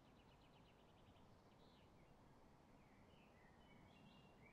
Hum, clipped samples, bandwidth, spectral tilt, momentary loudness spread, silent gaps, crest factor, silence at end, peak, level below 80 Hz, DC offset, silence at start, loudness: none; under 0.1%; 8.2 kHz; -5.5 dB/octave; 2 LU; none; 12 dB; 0 s; -56 dBFS; -78 dBFS; under 0.1%; 0 s; -69 LUFS